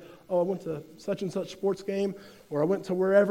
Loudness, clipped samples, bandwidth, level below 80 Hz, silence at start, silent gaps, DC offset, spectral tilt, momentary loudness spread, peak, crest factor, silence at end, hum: -30 LUFS; under 0.1%; 16 kHz; -68 dBFS; 0 s; none; under 0.1%; -7 dB/octave; 10 LU; -10 dBFS; 18 dB; 0 s; none